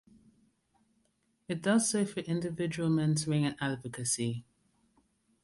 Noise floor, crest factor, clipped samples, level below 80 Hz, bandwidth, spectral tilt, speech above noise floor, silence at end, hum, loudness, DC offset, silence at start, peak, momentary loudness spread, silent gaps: -75 dBFS; 18 dB; under 0.1%; -68 dBFS; 11.5 kHz; -5 dB/octave; 44 dB; 1 s; none; -31 LUFS; under 0.1%; 1.5 s; -16 dBFS; 8 LU; none